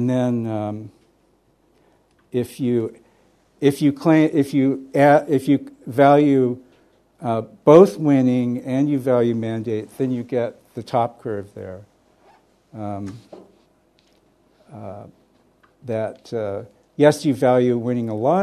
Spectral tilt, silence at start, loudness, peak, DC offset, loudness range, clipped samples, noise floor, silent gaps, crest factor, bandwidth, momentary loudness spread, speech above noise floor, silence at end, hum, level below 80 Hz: -7.5 dB/octave; 0 s; -19 LUFS; 0 dBFS; under 0.1%; 20 LU; under 0.1%; -61 dBFS; none; 20 dB; 13.5 kHz; 19 LU; 42 dB; 0 s; none; -64 dBFS